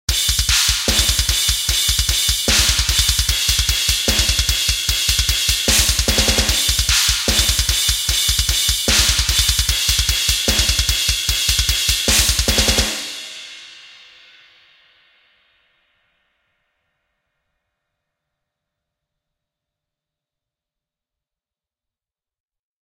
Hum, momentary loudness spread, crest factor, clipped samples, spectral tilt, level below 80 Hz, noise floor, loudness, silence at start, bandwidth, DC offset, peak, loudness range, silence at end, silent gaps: none; 3 LU; 20 dB; under 0.1%; -1 dB/octave; -26 dBFS; under -90 dBFS; -15 LUFS; 0.1 s; 17 kHz; under 0.1%; 0 dBFS; 4 LU; 8.95 s; none